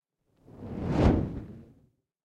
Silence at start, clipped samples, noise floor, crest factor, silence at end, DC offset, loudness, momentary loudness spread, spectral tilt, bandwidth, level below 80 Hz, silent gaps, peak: 0.5 s; under 0.1%; -66 dBFS; 20 dB; 0.6 s; under 0.1%; -28 LUFS; 22 LU; -9 dB/octave; 8.8 kHz; -38 dBFS; none; -12 dBFS